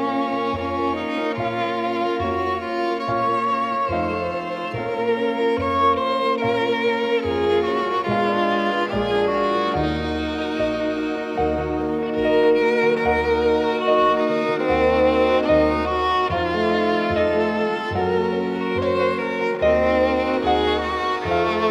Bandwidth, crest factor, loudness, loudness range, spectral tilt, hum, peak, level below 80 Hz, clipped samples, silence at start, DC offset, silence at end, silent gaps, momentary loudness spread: 10 kHz; 14 dB; -21 LUFS; 4 LU; -6.5 dB/octave; none; -6 dBFS; -44 dBFS; under 0.1%; 0 s; under 0.1%; 0 s; none; 6 LU